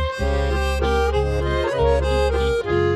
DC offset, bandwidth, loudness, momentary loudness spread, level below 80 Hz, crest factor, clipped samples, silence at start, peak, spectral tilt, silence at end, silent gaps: under 0.1%; 13 kHz; -21 LUFS; 3 LU; -24 dBFS; 12 dB; under 0.1%; 0 s; -6 dBFS; -6.5 dB/octave; 0 s; none